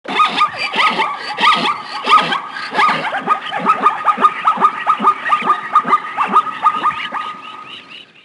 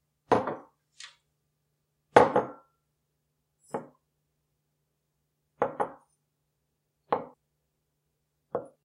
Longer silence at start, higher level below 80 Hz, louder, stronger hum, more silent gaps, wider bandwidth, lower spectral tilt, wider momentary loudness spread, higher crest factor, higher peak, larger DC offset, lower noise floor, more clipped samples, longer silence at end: second, 0.05 s vs 0.3 s; about the same, -66 dBFS vs -68 dBFS; first, -15 LUFS vs -28 LUFS; neither; neither; about the same, 11.5 kHz vs 11.5 kHz; second, -3 dB/octave vs -5.5 dB/octave; second, 11 LU vs 26 LU; second, 16 dB vs 32 dB; about the same, 0 dBFS vs -2 dBFS; neither; second, -36 dBFS vs -79 dBFS; neither; about the same, 0.25 s vs 0.2 s